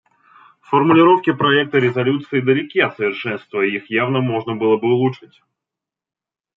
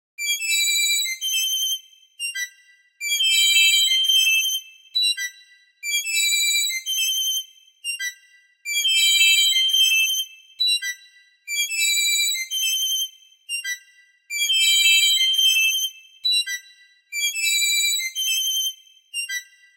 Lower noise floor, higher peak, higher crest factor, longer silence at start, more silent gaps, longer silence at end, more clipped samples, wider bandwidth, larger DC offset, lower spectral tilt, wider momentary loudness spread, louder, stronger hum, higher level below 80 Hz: first, -86 dBFS vs -55 dBFS; about the same, -2 dBFS vs -4 dBFS; about the same, 16 dB vs 18 dB; first, 0.7 s vs 0.2 s; neither; first, 1.4 s vs 0.35 s; neither; second, 5.6 kHz vs 16 kHz; neither; first, -8.5 dB/octave vs 9 dB/octave; second, 9 LU vs 16 LU; about the same, -17 LUFS vs -18 LUFS; neither; first, -66 dBFS vs -90 dBFS